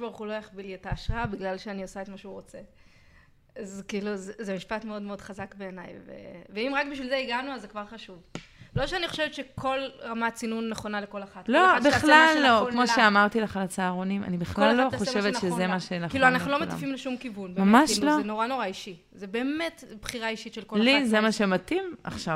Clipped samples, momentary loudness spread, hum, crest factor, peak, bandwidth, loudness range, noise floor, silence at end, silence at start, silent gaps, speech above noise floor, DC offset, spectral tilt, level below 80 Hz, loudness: under 0.1%; 20 LU; none; 24 dB; -4 dBFS; 15.5 kHz; 15 LU; -58 dBFS; 0 s; 0 s; none; 31 dB; under 0.1%; -4.5 dB/octave; -50 dBFS; -25 LUFS